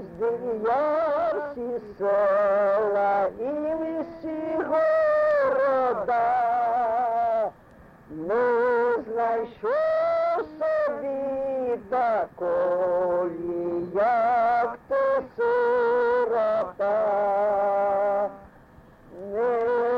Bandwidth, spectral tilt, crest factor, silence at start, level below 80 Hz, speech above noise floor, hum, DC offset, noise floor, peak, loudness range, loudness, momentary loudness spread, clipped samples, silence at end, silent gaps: 6.2 kHz; -7 dB/octave; 8 dB; 0 s; -60 dBFS; 27 dB; none; under 0.1%; -51 dBFS; -16 dBFS; 2 LU; -24 LUFS; 7 LU; under 0.1%; 0 s; none